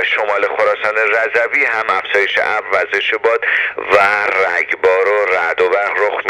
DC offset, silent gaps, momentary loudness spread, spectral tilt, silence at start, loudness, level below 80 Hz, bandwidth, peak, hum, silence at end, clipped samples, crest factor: under 0.1%; none; 3 LU; -2.5 dB/octave; 0 s; -14 LUFS; -58 dBFS; 12 kHz; 0 dBFS; none; 0 s; under 0.1%; 14 dB